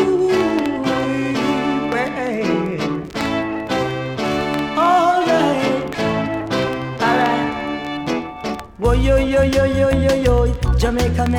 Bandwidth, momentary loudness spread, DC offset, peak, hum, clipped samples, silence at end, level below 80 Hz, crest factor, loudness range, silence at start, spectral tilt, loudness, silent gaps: 17.5 kHz; 8 LU; under 0.1%; -4 dBFS; none; under 0.1%; 0 s; -28 dBFS; 14 dB; 3 LU; 0 s; -6 dB/octave; -18 LUFS; none